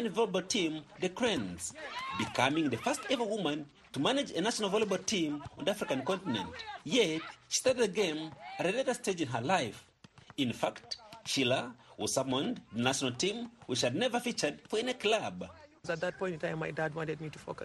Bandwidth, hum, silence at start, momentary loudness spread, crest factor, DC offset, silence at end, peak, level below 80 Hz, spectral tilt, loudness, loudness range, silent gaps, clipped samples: 12.5 kHz; none; 0 s; 11 LU; 20 dB; under 0.1%; 0 s; -14 dBFS; -68 dBFS; -3.5 dB/octave; -33 LUFS; 2 LU; none; under 0.1%